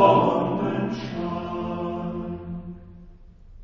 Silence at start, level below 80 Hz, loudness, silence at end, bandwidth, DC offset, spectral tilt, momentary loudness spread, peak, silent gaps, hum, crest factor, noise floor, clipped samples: 0 s; -48 dBFS; -26 LUFS; 0 s; 7.2 kHz; under 0.1%; -8 dB/octave; 16 LU; -4 dBFS; none; none; 22 dB; -46 dBFS; under 0.1%